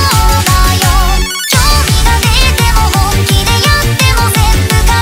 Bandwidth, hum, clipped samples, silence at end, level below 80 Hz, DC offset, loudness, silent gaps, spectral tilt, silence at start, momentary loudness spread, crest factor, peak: 18 kHz; none; 0.4%; 0 s; -12 dBFS; under 0.1%; -9 LUFS; none; -3.5 dB/octave; 0 s; 2 LU; 8 dB; 0 dBFS